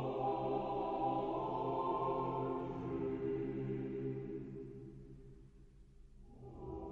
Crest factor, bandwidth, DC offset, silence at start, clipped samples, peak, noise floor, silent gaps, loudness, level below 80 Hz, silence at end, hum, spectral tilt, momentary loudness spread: 14 dB; 6.4 kHz; under 0.1%; 0 s; under 0.1%; -26 dBFS; -60 dBFS; none; -40 LUFS; -60 dBFS; 0 s; none; -9.5 dB/octave; 17 LU